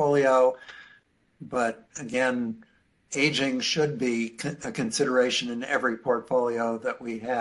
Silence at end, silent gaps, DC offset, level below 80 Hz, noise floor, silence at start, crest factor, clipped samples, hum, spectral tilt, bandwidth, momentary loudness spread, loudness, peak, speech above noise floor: 0 s; none; under 0.1%; -68 dBFS; -60 dBFS; 0 s; 16 dB; under 0.1%; none; -4 dB/octave; 11.5 kHz; 11 LU; -26 LUFS; -10 dBFS; 34 dB